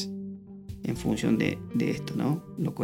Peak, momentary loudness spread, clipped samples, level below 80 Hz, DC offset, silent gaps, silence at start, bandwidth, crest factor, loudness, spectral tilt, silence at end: -10 dBFS; 14 LU; under 0.1%; -52 dBFS; under 0.1%; none; 0 s; 16.5 kHz; 20 dB; -30 LUFS; -6.5 dB/octave; 0 s